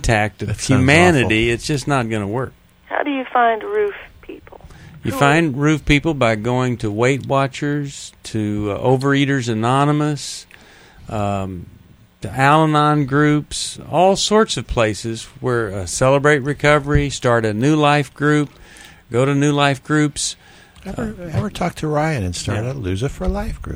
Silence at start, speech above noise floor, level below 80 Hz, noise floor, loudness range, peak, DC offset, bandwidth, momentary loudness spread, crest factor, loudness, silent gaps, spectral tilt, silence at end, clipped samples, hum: 0 s; 28 dB; -36 dBFS; -45 dBFS; 5 LU; 0 dBFS; under 0.1%; over 20 kHz; 13 LU; 18 dB; -18 LUFS; none; -5.5 dB/octave; 0 s; under 0.1%; none